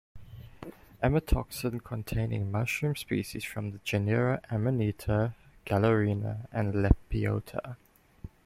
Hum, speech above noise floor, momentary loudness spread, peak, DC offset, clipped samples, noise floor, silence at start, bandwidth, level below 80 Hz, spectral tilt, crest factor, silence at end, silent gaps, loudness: none; 20 dB; 20 LU; -6 dBFS; under 0.1%; under 0.1%; -49 dBFS; 0.15 s; 16 kHz; -40 dBFS; -7 dB/octave; 24 dB; 0.2 s; none; -30 LUFS